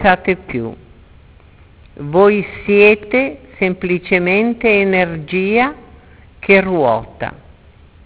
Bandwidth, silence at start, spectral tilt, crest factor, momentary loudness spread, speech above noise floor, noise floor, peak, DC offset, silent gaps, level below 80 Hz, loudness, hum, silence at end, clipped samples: 4 kHz; 0 s; -10 dB/octave; 16 dB; 14 LU; 30 dB; -44 dBFS; 0 dBFS; under 0.1%; none; -42 dBFS; -14 LUFS; none; 0.7 s; under 0.1%